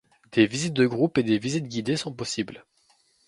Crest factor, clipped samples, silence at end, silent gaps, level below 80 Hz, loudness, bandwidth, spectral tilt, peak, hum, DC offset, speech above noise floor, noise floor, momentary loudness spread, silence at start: 22 dB; under 0.1%; 0.65 s; none; -64 dBFS; -25 LUFS; 11.5 kHz; -5 dB/octave; -4 dBFS; none; under 0.1%; 40 dB; -64 dBFS; 8 LU; 0.3 s